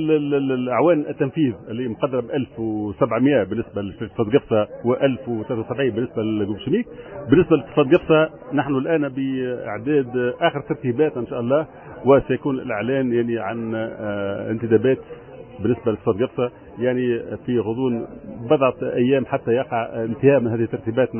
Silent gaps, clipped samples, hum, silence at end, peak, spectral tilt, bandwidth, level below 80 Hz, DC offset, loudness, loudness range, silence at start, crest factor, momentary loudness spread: none; under 0.1%; none; 0 s; -4 dBFS; -11 dB/octave; 3.4 kHz; -50 dBFS; under 0.1%; -21 LUFS; 3 LU; 0 s; 18 dB; 9 LU